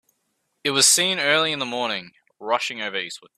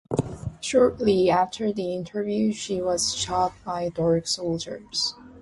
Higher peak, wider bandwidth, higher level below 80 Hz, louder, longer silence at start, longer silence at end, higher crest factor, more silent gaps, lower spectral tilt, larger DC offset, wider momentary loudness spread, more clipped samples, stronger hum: first, -2 dBFS vs -8 dBFS; first, 15.5 kHz vs 11.5 kHz; second, -72 dBFS vs -50 dBFS; first, -20 LUFS vs -25 LUFS; first, 0.65 s vs 0.1 s; first, 0.2 s vs 0 s; first, 22 dB vs 16 dB; neither; second, -0.5 dB/octave vs -4.5 dB/octave; neither; first, 14 LU vs 9 LU; neither; neither